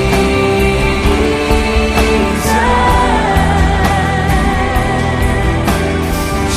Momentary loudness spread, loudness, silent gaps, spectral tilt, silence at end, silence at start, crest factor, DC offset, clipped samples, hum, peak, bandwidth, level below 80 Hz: 3 LU; -13 LUFS; none; -5.5 dB/octave; 0 s; 0 s; 12 dB; under 0.1%; under 0.1%; none; 0 dBFS; 15.5 kHz; -18 dBFS